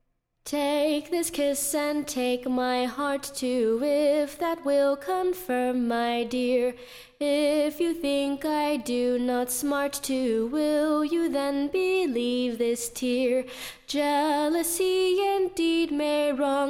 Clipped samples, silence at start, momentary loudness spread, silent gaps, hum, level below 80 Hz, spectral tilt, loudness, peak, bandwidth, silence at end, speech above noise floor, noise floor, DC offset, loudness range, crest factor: under 0.1%; 0.45 s; 5 LU; none; none; -58 dBFS; -2.5 dB/octave; -26 LUFS; -14 dBFS; 17.5 kHz; 0 s; 21 dB; -47 dBFS; under 0.1%; 1 LU; 12 dB